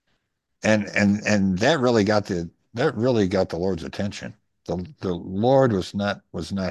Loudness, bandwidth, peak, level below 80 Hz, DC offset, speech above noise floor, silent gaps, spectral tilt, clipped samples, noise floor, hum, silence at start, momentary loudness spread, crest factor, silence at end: -23 LUFS; 10 kHz; -4 dBFS; -48 dBFS; under 0.1%; 52 dB; none; -6 dB/octave; under 0.1%; -74 dBFS; none; 0.65 s; 12 LU; 18 dB; 0 s